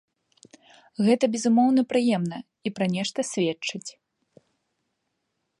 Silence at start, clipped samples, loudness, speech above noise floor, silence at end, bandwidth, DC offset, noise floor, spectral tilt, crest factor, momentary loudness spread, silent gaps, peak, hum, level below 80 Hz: 1 s; under 0.1%; -24 LUFS; 54 dB; 1.7 s; 11.5 kHz; under 0.1%; -78 dBFS; -5 dB/octave; 18 dB; 14 LU; none; -8 dBFS; none; -76 dBFS